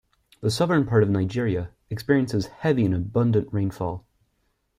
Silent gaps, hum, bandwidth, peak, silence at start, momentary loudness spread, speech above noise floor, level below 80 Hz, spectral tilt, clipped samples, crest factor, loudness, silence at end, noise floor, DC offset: none; none; 15 kHz; -6 dBFS; 0.4 s; 11 LU; 48 dB; -52 dBFS; -7 dB/octave; under 0.1%; 18 dB; -24 LUFS; 0.8 s; -71 dBFS; under 0.1%